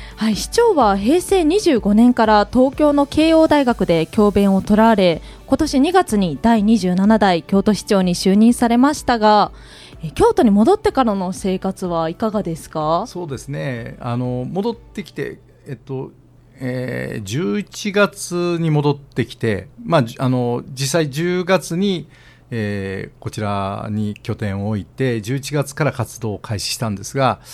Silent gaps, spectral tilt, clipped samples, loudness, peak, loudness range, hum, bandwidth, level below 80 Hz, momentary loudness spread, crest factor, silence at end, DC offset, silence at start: none; -6 dB/octave; under 0.1%; -17 LUFS; 0 dBFS; 10 LU; none; 15 kHz; -40 dBFS; 13 LU; 18 dB; 0 s; under 0.1%; 0 s